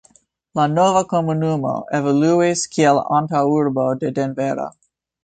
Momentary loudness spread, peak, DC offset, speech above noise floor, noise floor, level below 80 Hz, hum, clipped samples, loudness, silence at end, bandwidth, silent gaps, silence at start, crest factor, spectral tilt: 7 LU; -2 dBFS; under 0.1%; 38 dB; -56 dBFS; -58 dBFS; none; under 0.1%; -18 LUFS; 0.55 s; 9.4 kHz; none; 0.55 s; 16 dB; -6 dB/octave